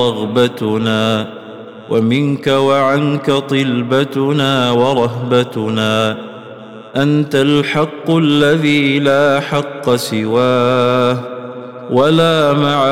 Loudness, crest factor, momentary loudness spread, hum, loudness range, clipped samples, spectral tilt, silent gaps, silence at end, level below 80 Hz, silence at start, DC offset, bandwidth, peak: -14 LUFS; 12 dB; 13 LU; none; 2 LU; under 0.1%; -6 dB/octave; none; 0 s; -54 dBFS; 0 s; 0.2%; 16 kHz; -2 dBFS